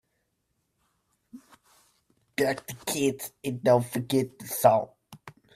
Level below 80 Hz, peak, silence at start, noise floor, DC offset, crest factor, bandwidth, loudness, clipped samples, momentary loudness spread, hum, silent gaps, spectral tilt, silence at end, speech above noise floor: -70 dBFS; -6 dBFS; 1.35 s; -77 dBFS; under 0.1%; 24 dB; 16 kHz; -27 LUFS; under 0.1%; 12 LU; none; none; -5 dB/octave; 0.25 s; 51 dB